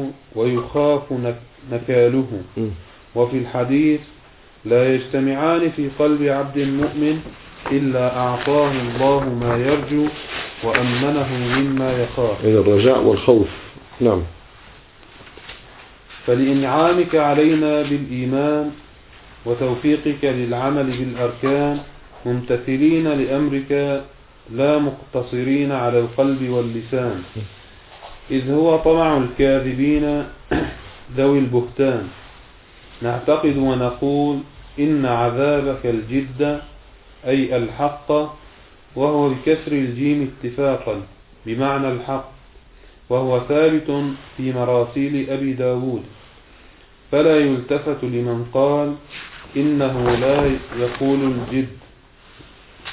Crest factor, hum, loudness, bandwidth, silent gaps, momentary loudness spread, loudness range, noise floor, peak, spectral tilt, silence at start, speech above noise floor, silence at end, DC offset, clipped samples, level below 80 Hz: 20 dB; none; -19 LUFS; 4 kHz; none; 12 LU; 4 LU; -47 dBFS; 0 dBFS; -11.5 dB/octave; 0 s; 29 dB; 0 s; under 0.1%; under 0.1%; -44 dBFS